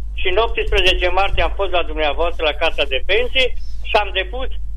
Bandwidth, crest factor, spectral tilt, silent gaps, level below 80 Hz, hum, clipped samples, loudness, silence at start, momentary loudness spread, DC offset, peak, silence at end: 9.2 kHz; 16 dB; -4.5 dB/octave; none; -24 dBFS; none; under 0.1%; -18 LUFS; 0 s; 6 LU; under 0.1%; -2 dBFS; 0 s